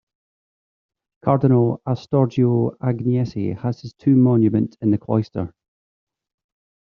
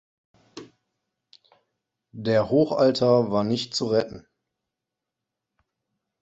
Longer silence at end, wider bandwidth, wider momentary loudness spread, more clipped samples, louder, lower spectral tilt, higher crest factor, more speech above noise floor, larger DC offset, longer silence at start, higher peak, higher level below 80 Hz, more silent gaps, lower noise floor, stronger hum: second, 1.45 s vs 2 s; second, 6.6 kHz vs 8.2 kHz; second, 11 LU vs 21 LU; neither; about the same, -20 LUFS vs -22 LUFS; first, -10 dB/octave vs -6 dB/octave; about the same, 18 dB vs 20 dB; first, over 71 dB vs 64 dB; neither; first, 1.25 s vs 0.55 s; first, -2 dBFS vs -6 dBFS; first, -56 dBFS vs -62 dBFS; neither; first, under -90 dBFS vs -86 dBFS; neither